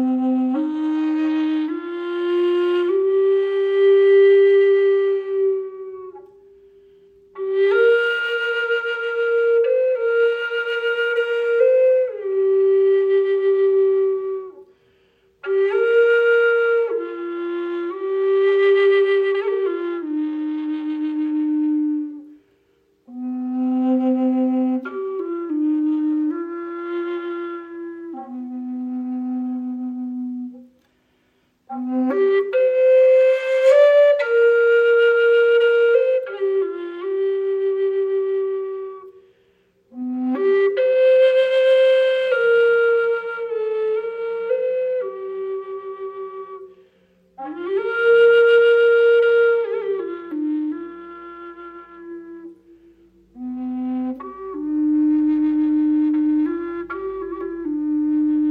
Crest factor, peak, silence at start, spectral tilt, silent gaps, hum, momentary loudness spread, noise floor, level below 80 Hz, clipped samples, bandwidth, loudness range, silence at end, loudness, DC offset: 14 dB; -4 dBFS; 0 s; -5 dB/octave; none; none; 17 LU; -63 dBFS; -66 dBFS; under 0.1%; 7.2 kHz; 12 LU; 0 s; -19 LUFS; under 0.1%